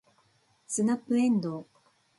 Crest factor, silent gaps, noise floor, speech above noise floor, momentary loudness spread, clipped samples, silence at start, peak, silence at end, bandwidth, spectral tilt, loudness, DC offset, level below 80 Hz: 14 dB; none; -67 dBFS; 40 dB; 11 LU; under 0.1%; 0.7 s; -18 dBFS; 0.55 s; 11.5 kHz; -5.5 dB/octave; -28 LUFS; under 0.1%; -76 dBFS